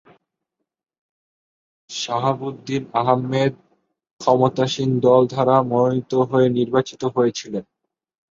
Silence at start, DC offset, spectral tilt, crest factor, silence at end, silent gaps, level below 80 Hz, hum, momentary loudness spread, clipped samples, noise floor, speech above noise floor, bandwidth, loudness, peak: 1.9 s; under 0.1%; -6.5 dB/octave; 18 dB; 0.7 s; 4.13-4.17 s; -62 dBFS; none; 11 LU; under 0.1%; -81 dBFS; 62 dB; 7.6 kHz; -19 LUFS; -2 dBFS